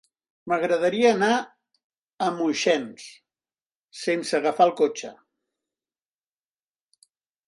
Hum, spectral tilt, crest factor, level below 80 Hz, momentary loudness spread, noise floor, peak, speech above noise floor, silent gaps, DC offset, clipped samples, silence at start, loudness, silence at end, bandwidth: none; -4 dB/octave; 20 dB; -74 dBFS; 21 LU; under -90 dBFS; -6 dBFS; over 67 dB; 1.84-1.90 s, 1.99-2.17 s, 3.66-3.70 s, 3.76-3.88 s; under 0.1%; under 0.1%; 0.45 s; -23 LUFS; 2.35 s; 11.5 kHz